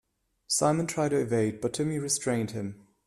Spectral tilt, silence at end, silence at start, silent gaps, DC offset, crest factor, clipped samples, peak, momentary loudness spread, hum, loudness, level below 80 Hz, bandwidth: -4.5 dB/octave; 0.3 s; 0.5 s; none; under 0.1%; 18 dB; under 0.1%; -10 dBFS; 7 LU; none; -28 LUFS; -64 dBFS; 15 kHz